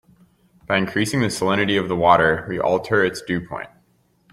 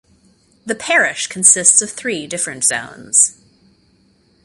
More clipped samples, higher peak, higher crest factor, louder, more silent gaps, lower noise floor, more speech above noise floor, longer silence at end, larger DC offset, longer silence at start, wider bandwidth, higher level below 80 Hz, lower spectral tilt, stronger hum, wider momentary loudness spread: neither; about the same, -2 dBFS vs 0 dBFS; about the same, 20 dB vs 18 dB; second, -20 LUFS vs -13 LUFS; neither; first, -61 dBFS vs -56 dBFS; about the same, 42 dB vs 40 dB; second, 0.65 s vs 1.15 s; neither; about the same, 0.7 s vs 0.65 s; about the same, 16 kHz vs 16 kHz; first, -52 dBFS vs -62 dBFS; first, -5 dB/octave vs -0.5 dB/octave; neither; second, 11 LU vs 14 LU